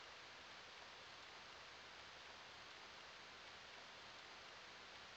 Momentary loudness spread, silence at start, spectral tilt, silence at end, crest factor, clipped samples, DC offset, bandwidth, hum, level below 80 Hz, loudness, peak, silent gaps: 0 LU; 0 s; -1.5 dB/octave; 0 s; 14 dB; under 0.1%; under 0.1%; 19 kHz; none; -82 dBFS; -57 LUFS; -44 dBFS; none